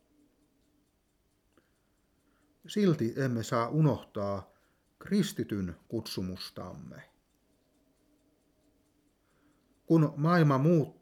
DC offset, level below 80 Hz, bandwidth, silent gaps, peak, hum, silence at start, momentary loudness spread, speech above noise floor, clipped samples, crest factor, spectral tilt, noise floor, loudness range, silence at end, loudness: under 0.1%; -68 dBFS; 16 kHz; none; -14 dBFS; none; 2.7 s; 16 LU; 44 dB; under 0.1%; 18 dB; -7 dB/octave; -73 dBFS; 12 LU; 0.1 s; -30 LUFS